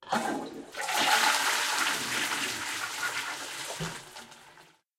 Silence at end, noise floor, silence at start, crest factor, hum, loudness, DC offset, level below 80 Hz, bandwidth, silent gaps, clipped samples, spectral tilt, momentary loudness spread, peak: 0.35 s; -57 dBFS; 0 s; 22 dB; none; -29 LUFS; under 0.1%; -68 dBFS; 16 kHz; none; under 0.1%; -0.5 dB/octave; 16 LU; -10 dBFS